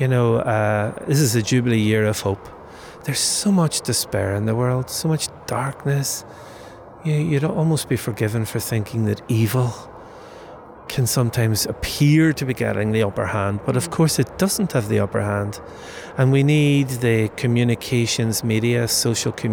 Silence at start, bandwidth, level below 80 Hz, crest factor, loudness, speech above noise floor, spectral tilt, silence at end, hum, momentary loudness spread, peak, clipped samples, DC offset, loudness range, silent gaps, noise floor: 0 s; over 20 kHz; -50 dBFS; 14 dB; -20 LUFS; 20 dB; -5 dB/octave; 0 s; none; 17 LU; -6 dBFS; under 0.1%; under 0.1%; 4 LU; none; -40 dBFS